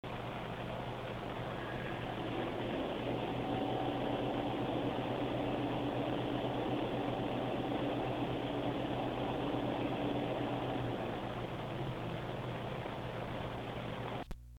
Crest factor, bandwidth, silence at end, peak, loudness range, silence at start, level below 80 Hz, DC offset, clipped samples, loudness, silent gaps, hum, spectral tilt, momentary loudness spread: 14 dB; 17.5 kHz; 0 s; -24 dBFS; 3 LU; 0.05 s; -56 dBFS; under 0.1%; under 0.1%; -38 LUFS; none; none; -7.5 dB/octave; 5 LU